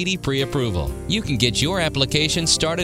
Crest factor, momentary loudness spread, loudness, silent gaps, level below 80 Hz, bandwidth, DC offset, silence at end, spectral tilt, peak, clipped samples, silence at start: 20 dB; 6 LU; -20 LUFS; none; -36 dBFS; 16 kHz; under 0.1%; 0 s; -3.5 dB/octave; 0 dBFS; under 0.1%; 0 s